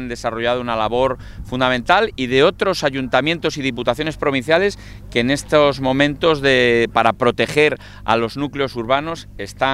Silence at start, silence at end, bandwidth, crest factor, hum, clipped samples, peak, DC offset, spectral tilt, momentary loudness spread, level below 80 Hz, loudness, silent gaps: 0 s; 0 s; 14.5 kHz; 18 dB; 50 Hz at -45 dBFS; under 0.1%; 0 dBFS; under 0.1%; -5 dB/octave; 8 LU; -40 dBFS; -17 LUFS; none